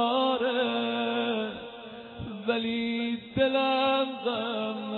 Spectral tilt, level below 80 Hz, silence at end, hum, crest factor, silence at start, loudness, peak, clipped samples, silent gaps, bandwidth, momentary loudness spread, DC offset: -7.5 dB/octave; -60 dBFS; 0 s; none; 16 dB; 0 s; -28 LUFS; -12 dBFS; under 0.1%; none; 4.5 kHz; 15 LU; under 0.1%